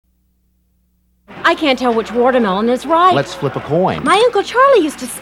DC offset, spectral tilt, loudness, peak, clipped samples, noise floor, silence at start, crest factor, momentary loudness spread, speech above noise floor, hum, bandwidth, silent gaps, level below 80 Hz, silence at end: under 0.1%; -5 dB/octave; -14 LUFS; 0 dBFS; under 0.1%; -60 dBFS; 1.3 s; 14 dB; 6 LU; 46 dB; none; 14.5 kHz; none; -48 dBFS; 0 s